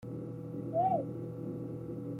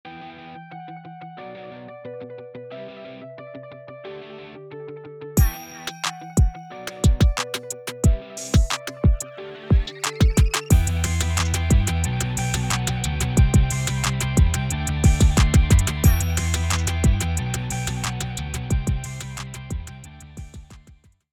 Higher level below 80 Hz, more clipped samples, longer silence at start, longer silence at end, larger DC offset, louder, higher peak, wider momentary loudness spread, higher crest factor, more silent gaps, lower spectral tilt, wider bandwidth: second, -68 dBFS vs -26 dBFS; neither; about the same, 0 s vs 0.05 s; second, 0 s vs 0.55 s; neither; second, -37 LUFS vs -22 LUFS; second, -20 dBFS vs -4 dBFS; second, 11 LU vs 20 LU; about the same, 16 dB vs 18 dB; neither; first, -10.5 dB/octave vs -5 dB/octave; second, 12 kHz vs 18.5 kHz